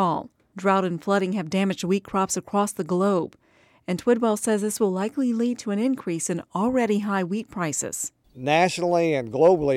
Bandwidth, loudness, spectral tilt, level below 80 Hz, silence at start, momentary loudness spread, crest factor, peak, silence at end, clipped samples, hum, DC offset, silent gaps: 15.5 kHz; -24 LUFS; -5 dB/octave; -60 dBFS; 0 s; 8 LU; 16 dB; -6 dBFS; 0 s; under 0.1%; none; under 0.1%; none